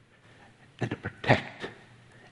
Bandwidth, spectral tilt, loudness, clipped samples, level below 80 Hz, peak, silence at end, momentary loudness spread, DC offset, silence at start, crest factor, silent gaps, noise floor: 11 kHz; -6.5 dB/octave; -30 LUFS; under 0.1%; -60 dBFS; -4 dBFS; 0.55 s; 16 LU; under 0.1%; 0.8 s; 28 dB; none; -56 dBFS